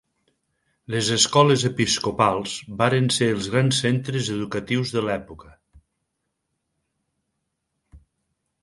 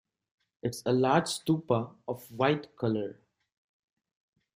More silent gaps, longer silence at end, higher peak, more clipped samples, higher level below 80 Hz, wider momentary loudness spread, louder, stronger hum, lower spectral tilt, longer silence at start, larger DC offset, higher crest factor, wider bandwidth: neither; second, 0.65 s vs 1.45 s; first, -2 dBFS vs -12 dBFS; neither; first, -54 dBFS vs -68 dBFS; second, 10 LU vs 13 LU; first, -21 LUFS vs -30 LUFS; neither; second, -4 dB/octave vs -5.5 dB/octave; first, 0.9 s vs 0.65 s; neither; about the same, 22 dB vs 20 dB; second, 11.5 kHz vs 15.5 kHz